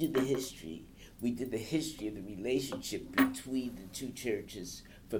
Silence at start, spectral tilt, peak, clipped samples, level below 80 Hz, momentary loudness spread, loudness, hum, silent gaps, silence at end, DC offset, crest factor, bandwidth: 0 s; -4.5 dB/octave; -14 dBFS; under 0.1%; -58 dBFS; 15 LU; -36 LUFS; none; none; 0 s; under 0.1%; 22 dB; 17.5 kHz